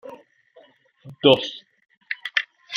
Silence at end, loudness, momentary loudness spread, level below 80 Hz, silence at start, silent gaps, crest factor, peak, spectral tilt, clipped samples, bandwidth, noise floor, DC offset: 0 s; -22 LUFS; 22 LU; -68 dBFS; 0.05 s; 1.97-2.01 s; 24 dB; 0 dBFS; -5 dB/octave; under 0.1%; 7.2 kHz; -55 dBFS; under 0.1%